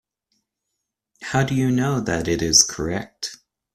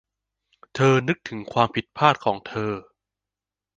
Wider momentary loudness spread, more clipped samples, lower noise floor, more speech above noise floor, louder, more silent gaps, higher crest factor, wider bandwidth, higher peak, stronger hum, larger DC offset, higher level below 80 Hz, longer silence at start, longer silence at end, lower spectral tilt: first, 17 LU vs 10 LU; neither; second, -80 dBFS vs -89 dBFS; second, 59 dB vs 67 dB; first, -20 LUFS vs -23 LUFS; neither; about the same, 22 dB vs 22 dB; first, 14 kHz vs 9.2 kHz; about the same, 0 dBFS vs -2 dBFS; second, none vs 50 Hz at -55 dBFS; neither; first, -46 dBFS vs -60 dBFS; first, 1.2 s vs 0.75 s; second, 0.4 s vs 0.95 s; second, -3.5 dB/octave vs -6 dB/octave